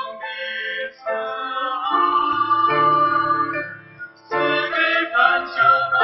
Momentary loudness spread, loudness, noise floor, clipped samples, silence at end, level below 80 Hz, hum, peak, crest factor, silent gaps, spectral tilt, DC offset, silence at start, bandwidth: 12 LU; -19 LUFS; -40 dBFS; under 0.1%; 0 s; -66 dBFS; none; 0 dBFS; 20 dB; none; -6 dB/octave; under 0.1%; 0 s; 6 kHz